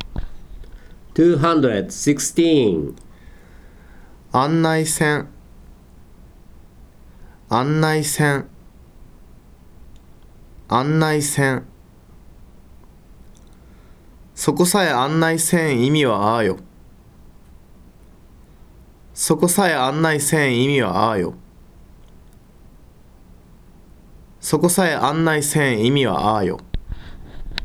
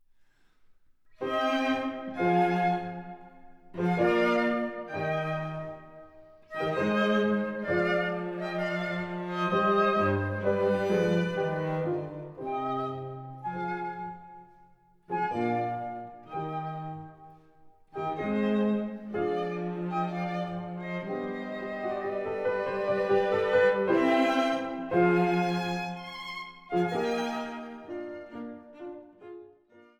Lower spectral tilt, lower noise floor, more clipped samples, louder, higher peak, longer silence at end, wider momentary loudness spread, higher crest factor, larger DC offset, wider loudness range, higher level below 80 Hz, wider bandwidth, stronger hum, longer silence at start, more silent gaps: second, -4.5 dB/octave vs -7 dB/octave; second, -46 dBFS vs -62 dBFS; neither; first, -18 LUFS vs -29 LUFS; first, -2 dBFS vs -12 dBFS; second, 0 s vs 0.2 s; about the same, 16 LU vs 16 LU; about the same, 18 dB vs 18 dB; neither; about the same, 6 LU vs 8 LU; first, -42 dBFS vs -66 dBFS; first, 18.5 kHz vs 12 kHz; neither; second, 0 s vs 0.7 s; neither